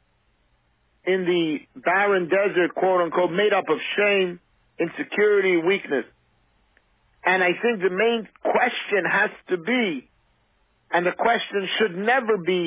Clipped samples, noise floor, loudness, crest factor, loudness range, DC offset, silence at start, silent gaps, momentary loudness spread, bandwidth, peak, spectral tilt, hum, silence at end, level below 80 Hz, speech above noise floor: under 0.1%; -66 dBFS; -22 LUFS; 16 dB; 2 LU; under 0.1%; 1.05 s; none; 8 LU; 4 kHz; -8 dBFS; -8.5 dB/octave; none; 0 s; -70 dBFS; 44 dB